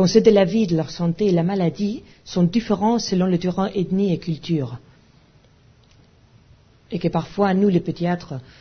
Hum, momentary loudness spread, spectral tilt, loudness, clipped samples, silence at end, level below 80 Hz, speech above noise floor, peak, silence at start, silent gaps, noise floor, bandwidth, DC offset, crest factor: none; 10 LU; -7 dB/octave; -21 LUFS; under 0.1%; 0.2 s; -50 dBFS; 34 dB; -2 dBFS; 0 s; none; -53 dBFS; 6.6 kHz; under 0.1%; 18 dB